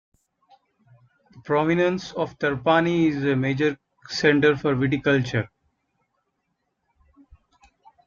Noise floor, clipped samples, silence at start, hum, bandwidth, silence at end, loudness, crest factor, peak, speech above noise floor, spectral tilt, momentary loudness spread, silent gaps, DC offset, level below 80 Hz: -76 dBFS; under 0.1%; 1.35 s; none; 7.4 kHz; 2.6 s; -22 LUFS; 20 dB; -4 dBFS; 54 dB; -6.5 dB/octave; 9 LU; none; under 0.1%; -58 dBFS